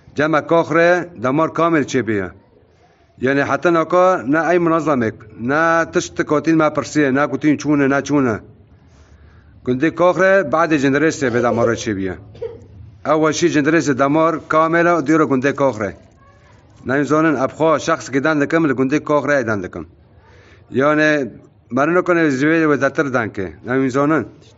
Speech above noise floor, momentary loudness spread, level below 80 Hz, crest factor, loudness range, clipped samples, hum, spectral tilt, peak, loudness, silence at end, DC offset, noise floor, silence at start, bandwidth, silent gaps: 36 dB; 10 LU; -54 dBFS; 16 dB; 2 LU; under 0.1%; none; -5 dB/octave; -2 dBFS; -16 LUFS; 0.3 s; under 0.1%; -52 dBFS; 0.15 s; 8 kHz; none